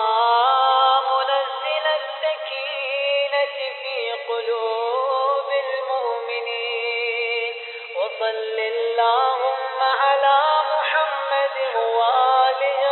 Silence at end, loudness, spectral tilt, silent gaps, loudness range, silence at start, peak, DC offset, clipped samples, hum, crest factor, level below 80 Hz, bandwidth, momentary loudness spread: 0 s; -21 LUFS; -1 dB/octave; none; 4 LU; 0 s; -6 dBFS; under 0.1%; under 0.1%; none; 16 dB; under -90 dBFS; 4.3 kHz; 9 LU